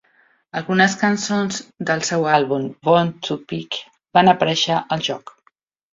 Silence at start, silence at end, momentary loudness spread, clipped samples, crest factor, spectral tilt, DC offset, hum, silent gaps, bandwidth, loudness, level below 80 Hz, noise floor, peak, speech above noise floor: 0.55 s; 0.75 s; 12 LU; under 0.1%; 18 dB; -4.5 dB/octave; under 0.1%; none; none; 7.8 kHz; -19 LUFS; -60 dBFS; -62 dBFS; -2 dBFS; 43 dB